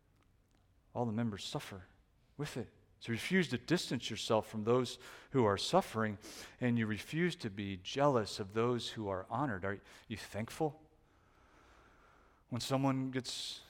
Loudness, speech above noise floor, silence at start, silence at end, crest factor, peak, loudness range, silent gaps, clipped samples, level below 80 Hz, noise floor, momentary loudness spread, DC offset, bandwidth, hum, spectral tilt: -37 LUFS; 34 dB; 0.95 s; 0.05 s; 22 dB; -16 dBFS; 8 LU; none; under 0.1%; -68 dBFS; -70 dBFS; 14 LU; under 0.1%; 17 kHz; none; -5.5 dB/octave